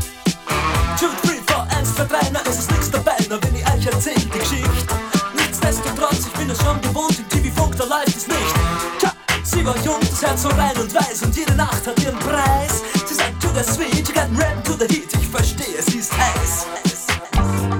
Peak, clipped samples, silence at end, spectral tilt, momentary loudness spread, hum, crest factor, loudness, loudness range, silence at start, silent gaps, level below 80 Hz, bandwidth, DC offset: -2 dBFS; under 0.1%; 0 s; -4 dB/octave; 3 LU; none; 18 dB; -19 LUFS; 1 LU; 0 s; none; -28 dBFS; 19.5 kHz; under 0.1%